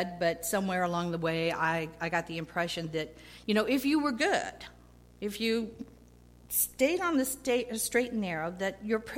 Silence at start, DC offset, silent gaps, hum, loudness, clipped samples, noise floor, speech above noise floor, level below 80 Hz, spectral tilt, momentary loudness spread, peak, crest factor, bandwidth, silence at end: 0 s; under 0.1%; none; 60 Hz at -55 dBFS; -31 LUFS; under 0.1%; -56 dBFS; 25 dB; -58 dBFS; -4 dB/octave; 12 LU; -12 dBFS; 18 dB; 16.5 kHz; 0 s